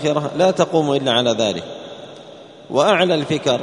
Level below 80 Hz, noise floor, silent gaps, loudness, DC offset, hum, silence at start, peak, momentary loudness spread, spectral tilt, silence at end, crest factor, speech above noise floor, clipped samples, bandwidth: -60 dBFS; -40 dBFS; none; -17 LUFS; under 0.1%; none; 0 s; 0 dBFS; 20 LU; -4.5 dB/octave; 0 s; 18 dB; 22 dB; under 0.1%; 10.5 kHz